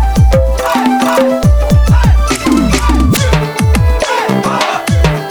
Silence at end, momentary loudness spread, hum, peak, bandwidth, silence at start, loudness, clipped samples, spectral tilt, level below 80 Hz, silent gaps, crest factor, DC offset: 0 s; 3 LU; none; 0 dBFS; over 20 kHz; 0 s; -11 LUFS; under 0.1%; -5.5 dB/octave; -14 dBFS; none; 10 dB; under 0.1%